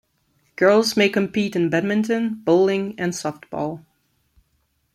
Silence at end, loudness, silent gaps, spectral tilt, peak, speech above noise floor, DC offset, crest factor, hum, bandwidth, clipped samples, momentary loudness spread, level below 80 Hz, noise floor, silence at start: 1.15 s; -20 LUFS; none; -5 dB/octave; -4 dBFS; 48 dB; under 0.1%; 18 dB; none; 14.5 kHz; under 0.1%; 12 LU; -62 dBFS; -68 dBFS; 0.6 s